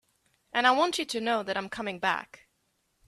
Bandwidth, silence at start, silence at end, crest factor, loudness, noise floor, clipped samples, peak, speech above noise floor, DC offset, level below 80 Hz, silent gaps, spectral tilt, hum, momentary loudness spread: 14.5 kHz; 0.55 s; 0.85 s; 22 dB; -28 LUFS; -75 dBFS; under 0.1%; -8 dBFS; 46 dB; under 0.1%; -70 dBFS; none; -2.5 dB/octave; none; 11 LU